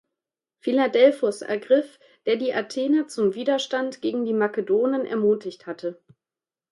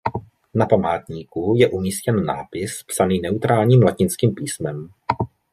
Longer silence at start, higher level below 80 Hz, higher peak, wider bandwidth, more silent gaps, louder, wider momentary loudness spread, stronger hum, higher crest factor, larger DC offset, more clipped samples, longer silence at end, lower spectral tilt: first, 0.65 s vs 0.05 s; second, -74 dBFS vs -54 dBFS; about the same, -4 dBFS vs -2 dBFS; second, 11.5 kHz vs 15 kHz; neither; second, -23 LUFS vs -20 LUFS; about the same, 14 LU vs 13 LU; neither; about the same, 18 dB vs 18 dB; neither; neither; first, 0.8 s vs 0.25 s; about the same, -5 dB/octave vs -6 dB/octave